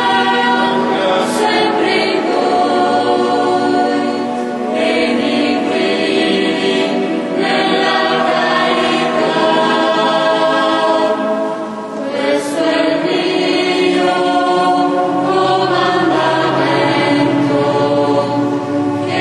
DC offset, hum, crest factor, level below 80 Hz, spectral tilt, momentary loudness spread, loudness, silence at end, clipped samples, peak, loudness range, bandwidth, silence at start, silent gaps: under 0.1%; none; 12 dB; -56 dBFS; -5 dB/octave; 4 LU; -14 LUFS; 0 s; under 0.1%; -2 dBFS; 2 LU; 12 kHz; 0 s; none